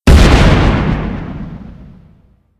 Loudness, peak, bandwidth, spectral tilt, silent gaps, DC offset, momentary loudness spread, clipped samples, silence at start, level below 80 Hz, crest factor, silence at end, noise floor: -11 LUFS; 0 dBFS; 13.5 kHz; -6 dB/octave; none; under 0.1%; 21 LU; 2%; 0.05 s; -14 dBFS; 12 dB; 0.9 s; -48 dBFS